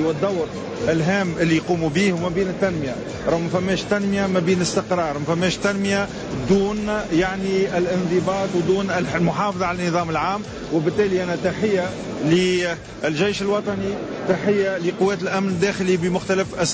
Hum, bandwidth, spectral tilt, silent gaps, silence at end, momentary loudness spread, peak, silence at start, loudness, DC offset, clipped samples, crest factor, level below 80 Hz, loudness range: none; 8 kHz; -5.5 dB/octave; none; 0 s; 6 LU; -8 dBFS; 0 s; -21 LUFS; under 0.1%; under 0.1%; 14 dB; -46 dBFS; 1 LU